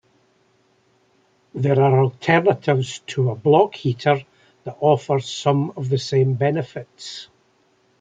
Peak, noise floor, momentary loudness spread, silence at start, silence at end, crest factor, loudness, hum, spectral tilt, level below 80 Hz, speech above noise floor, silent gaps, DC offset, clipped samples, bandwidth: -2 dBFS; -61 dBFS; 17 LU; 1.55 s; 0.75 s; 18 dB; -20 LUFS; none; -6.5 dB/octave; -64 dBFS; 42 dB; none; under 0.1%; under 0.1%; 7.8 kHz